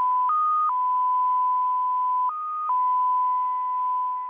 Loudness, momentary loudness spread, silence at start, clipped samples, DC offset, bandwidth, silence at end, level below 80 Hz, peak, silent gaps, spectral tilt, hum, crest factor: -23 LUFS; 4 LU; 0 s; under 0.1%; under 0.1%; 3.5 kHz; 0 s; -78 dBFS; -16 dBFS; none; -4 dB/octave; none; 6 dB